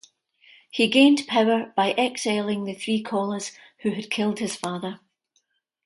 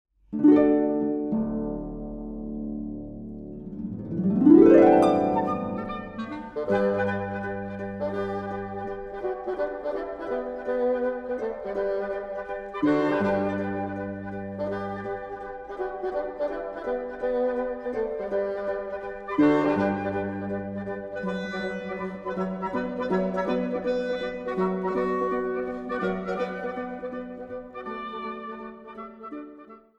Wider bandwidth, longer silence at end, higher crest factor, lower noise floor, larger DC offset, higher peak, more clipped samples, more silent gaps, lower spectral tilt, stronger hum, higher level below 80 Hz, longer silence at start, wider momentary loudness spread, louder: first, 11.5 kHz vs 8.4 kHz; first, 0.9 s vs 0.2 s; about the same, 20 dB vs 22 dB; first, -71 dBFS vs -48 dBFS; neither; about the same, -4 dBFS vs -4 dBFS; neither; neither; second, -4 dB/octave vs -8.5 dB/octave; neither; second, -72 dBFS vs -52 dBFS; first, 0.75 s vs 0.3 s; about the same, 15 LU vs 15 LU; first, -23 LUFS vs -27 LUFS